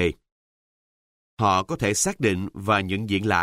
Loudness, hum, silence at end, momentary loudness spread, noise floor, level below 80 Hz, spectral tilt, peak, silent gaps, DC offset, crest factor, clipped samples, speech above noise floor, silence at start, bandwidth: -23 LUFS; none; 0 s; 5 LU; under -90 dBFS; -50 dBFS; -4 dB/octave; -6 dBFS; 0.32-1.37 s; under 0.1%; 18 dB; under 0.1%; over 67 dB; 0 s; 16 kHz